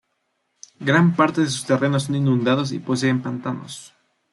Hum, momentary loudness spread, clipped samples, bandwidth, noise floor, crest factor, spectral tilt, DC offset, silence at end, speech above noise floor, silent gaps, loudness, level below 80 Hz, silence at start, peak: none; 12 LU; under 0.1%; 12 kHz; -72 dBFS; 18 dB; -6 dB/octave; under 0.1%; 0.45 s; 52 dB; none; -20 LUFS; -64 dBFS; 0.8 s; -4 dBFS